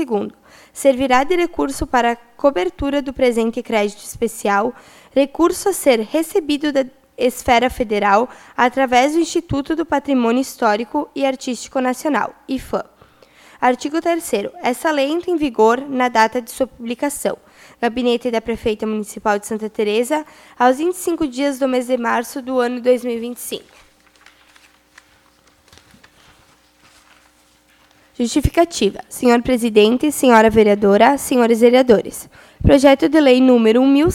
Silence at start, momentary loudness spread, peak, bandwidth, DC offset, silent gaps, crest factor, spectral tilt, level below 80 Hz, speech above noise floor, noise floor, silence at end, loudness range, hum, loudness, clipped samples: 0 s; 11 LU; 0 dBFS; 16.5 kHz; under 0.1%; none; 18 dB; -4.5 dB/octave; -40 dBFS; 38 dB; -54 dBFS; 0 s; 8 LU; none; -17 LUFS; under 0.1%